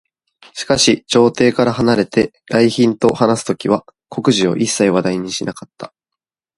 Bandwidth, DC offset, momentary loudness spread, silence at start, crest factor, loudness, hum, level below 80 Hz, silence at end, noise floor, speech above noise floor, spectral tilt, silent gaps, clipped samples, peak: 11.5 kHz; under 0.1%; 16 LU; 0.55 s; 16 dB; -15 LUFS; none; -50 dBFS; 0.7 s; -83 dBFS; 68 dB; -4.5 dB/octave; none; under 0.1%; 0 dBFS